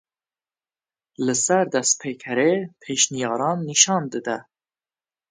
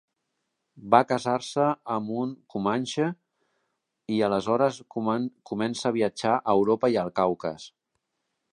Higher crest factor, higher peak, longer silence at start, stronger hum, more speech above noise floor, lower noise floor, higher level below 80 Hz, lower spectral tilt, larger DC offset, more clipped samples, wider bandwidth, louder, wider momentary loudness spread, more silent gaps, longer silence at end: about the same, 24 dB vs 24 dB; about the same, 0 dBFS vs -2 dBFS; first, 1.2 s vs 0.75 s; neither; first, over 68 dB vs 55 dB; first, under -90 dBFS vs -80 dBFS; second, -72 dBFS vs -66 dBFS; second, -2.5 dB/octave vs -5.5 dB/octave; neither; neither; second, 10 kHz vs 11.5 kHz; first, -21 LUFS vs -26 LUFS; about the same, 11 LU vs 10 LU; neither; about the same, 0.9 s vs 0.85 s